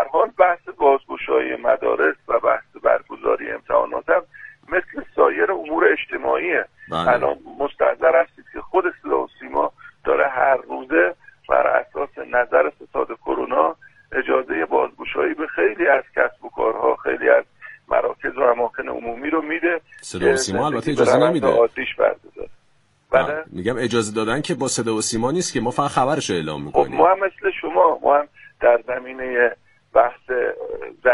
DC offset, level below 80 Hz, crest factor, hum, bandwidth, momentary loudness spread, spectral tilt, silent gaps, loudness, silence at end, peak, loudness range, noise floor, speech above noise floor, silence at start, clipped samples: under 0.1%; -52 dBFS; 20 dB; none; 11.5 kHz; 9 LU; -4.5 dB/octave; none; -20 LUFS; 0 s; 0 dBFS; 2 LU; -61 dBFS; 42 dB; 0 s; under 0.1%